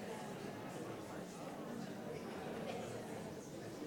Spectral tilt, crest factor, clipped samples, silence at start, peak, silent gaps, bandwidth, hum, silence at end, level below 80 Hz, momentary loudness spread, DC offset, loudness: -5.5 dB/octave; 14 dB; under 0.1%; 0 s; -32 dBFS; none; 18 kHz; none; 0 s; -76 dBFS; 4 LU; under 0.1%; -47 LUFS